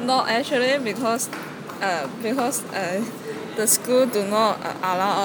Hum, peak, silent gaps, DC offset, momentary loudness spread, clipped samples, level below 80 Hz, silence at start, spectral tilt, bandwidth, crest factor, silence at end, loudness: none; -4 dBFS; none; under 0.1%; 10 LU; under 0.1%; -70 dBFS; 0 s; -2.5 dB/octave; 19 kHz; 18 dB; 0 s; -22 LUFS